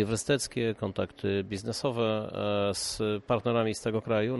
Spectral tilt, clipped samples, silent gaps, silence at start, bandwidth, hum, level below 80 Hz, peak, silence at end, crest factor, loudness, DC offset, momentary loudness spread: -5 dB/octave; under 0.1%; none; 0 s; 11.5 kHz; none; -58 dBFS; -14 dBFS; 0 s; 16 dB; -30 LUFS; under 0.1%; 4 LU